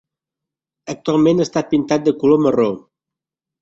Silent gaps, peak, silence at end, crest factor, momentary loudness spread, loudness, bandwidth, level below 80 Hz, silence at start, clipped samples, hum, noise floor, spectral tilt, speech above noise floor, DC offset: none; -2 dBFS; 0.85 s; 16 dB; 16 LU; -16 LUFS; 7.8 kHz; -58 dBFS; 0.85 s; under 0.1%; none; -86 dBFS; -6.5 dB/octave; 70 dB; under 0.1%